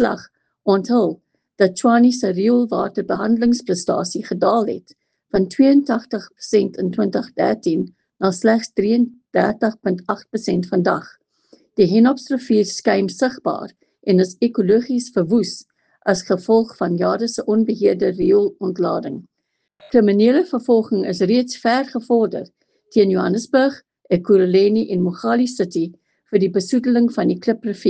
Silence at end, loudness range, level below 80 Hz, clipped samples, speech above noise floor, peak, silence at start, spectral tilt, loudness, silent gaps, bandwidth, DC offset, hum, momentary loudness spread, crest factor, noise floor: 0 s; 2 LU; -58 dBFS; under 0.1%; 57 dB; 0 dBFS; 0 s; -6 dB/octave; -18 LUFS; none; 9.2 kHz; under 0.1%; none; 9 LU; 16 dB; -74 dBFS